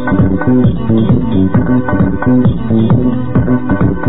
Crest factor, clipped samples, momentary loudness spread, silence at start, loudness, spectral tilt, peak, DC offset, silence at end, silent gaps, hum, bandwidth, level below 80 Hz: 8 dB; under 0.1%; 3 LU; 0 s; -12 LUFS; -13 dB/octave; 0 dBFS; 10%; 0 s; none; none; 4 kHz; -26 dBFS